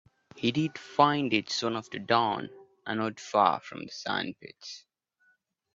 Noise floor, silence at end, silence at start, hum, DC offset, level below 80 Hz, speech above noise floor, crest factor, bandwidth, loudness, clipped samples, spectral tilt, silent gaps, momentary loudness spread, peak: -71 dBFS; 0.95 s; 0.35 s; none; under 0.1%; -72 dBFS; 42 dB; 24 dB; 7.8 kHz; -29 LUFS; under 0.1%; -4.5 dB/octave; none; 19 LU; -8 dBFS